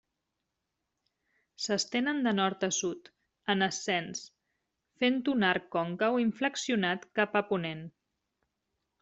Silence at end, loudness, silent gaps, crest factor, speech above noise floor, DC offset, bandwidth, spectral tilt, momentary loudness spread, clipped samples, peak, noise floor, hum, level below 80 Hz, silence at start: 1.15 s; -30 LUFS; none; 22 dB; 54 dB; under 0.1%; 8.2 kHz; -3.5 dB/octave; 11 LU; under 0.1%; -12 dBFS; -85 dBFS; none; -74 dBFS; 1.6 s